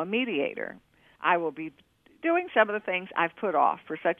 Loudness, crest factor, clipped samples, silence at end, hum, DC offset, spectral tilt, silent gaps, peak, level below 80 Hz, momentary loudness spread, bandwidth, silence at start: -27 LUFS; 20 dB; under 0.1%; 0.05 s; none; under 0.1%; -7 dB/octave; none; -8 dBFS; -76 dBFS; 12 LU; 3.8 kHz; 0 s